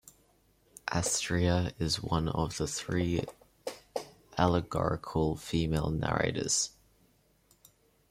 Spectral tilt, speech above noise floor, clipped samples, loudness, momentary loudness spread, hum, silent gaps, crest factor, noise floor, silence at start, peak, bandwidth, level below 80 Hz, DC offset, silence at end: -4.5 dB/octave; 37 dB; under 0.1%; -31 LUFS; 13 LU; none; none; 22 dB; -68 dBFS; 0.85 s; -10 dBFS; 16 kHz; -50 dBFS; under 0.1%; 1.4 s